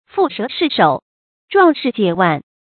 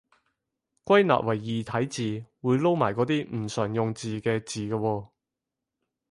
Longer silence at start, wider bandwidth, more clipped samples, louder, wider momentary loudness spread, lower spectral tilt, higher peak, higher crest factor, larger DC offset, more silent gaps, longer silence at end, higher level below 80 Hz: second, 0.15 s vs 0.85 s; second, 4.6 kHz vs 11.5 kHz; neither; first, -16 LUFS vs -27 LUFS; second, 6 LU vs 10 LU; first, -11 dB/octave vs -6 dB/octave; first, 0 dBFS vs -6 dBFS; about the same, 16 dB vs 20 dB; neither; first, 1.02-1.48 s vs none; second, 0.2 s vs 1.05 s; about the same, -60 dBFS vs -62 dBFS